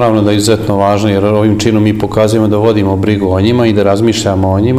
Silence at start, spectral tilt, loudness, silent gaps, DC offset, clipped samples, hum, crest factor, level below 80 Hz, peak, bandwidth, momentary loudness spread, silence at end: 0 s; -6.5 dB/octave; -10 LUFS; none; under 0.1%; 0.2%; none; 10 dB; -36 dBFS; 0 dBFS; 15 kHz; 2 LU; 0 s